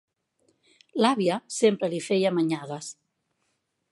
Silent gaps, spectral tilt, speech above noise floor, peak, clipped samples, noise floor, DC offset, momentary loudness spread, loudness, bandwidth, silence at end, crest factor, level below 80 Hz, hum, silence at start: none; -5 dB/octave; 51 dB; -6 dBFS; under 0.1%; -76 dBFS; under 0.1%; 13 LU; -25 LUFS; 11.5 kHz; 1 s; 22 dB; -80 dBFS; none; 0.95 s